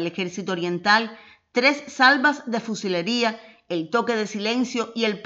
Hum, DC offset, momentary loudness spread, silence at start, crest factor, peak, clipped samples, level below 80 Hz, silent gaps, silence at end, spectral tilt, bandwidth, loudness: none; under 0.1%; 11 LU; 0 s; 20 dB; -4 dBFS; under 0.1%; -74 dBFS; none; 0 s; -4 dB/octave; 8 kHz; -22 LUFS